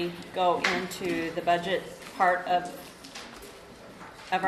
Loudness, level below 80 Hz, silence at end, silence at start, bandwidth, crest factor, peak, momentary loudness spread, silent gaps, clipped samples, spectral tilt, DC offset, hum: -28 LUFS; -62 dBFS; 0 s; 0 s; 13.5 kHz; 20 dB; -10 dBFS; 20 LU; none; under 0.1%; -4 dB/octave; under 0.1%; none